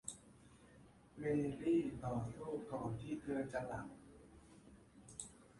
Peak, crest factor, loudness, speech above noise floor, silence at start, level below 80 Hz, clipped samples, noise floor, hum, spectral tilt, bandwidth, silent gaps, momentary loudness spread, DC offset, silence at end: -26 dBFS; 18 dB; -43 LUFS; 23 dB; 0.05 s; -66 dBFS; under 0.1%; -64 dBFS; none; -6.5 dB/octave; 11.5 kHz; none; 26 LU; under 0.1%; 0 s